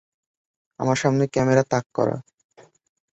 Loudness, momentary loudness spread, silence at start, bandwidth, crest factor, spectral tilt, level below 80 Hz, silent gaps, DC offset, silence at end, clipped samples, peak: -22 LUFS; 7 LU; 0.8 s; 8.2 kHz; 22 dB; -6 dB/octave; -58 dBFS; 1.86-1.90 s; under 0.1%; 0.95 s; under 0.1%; -2 dBFS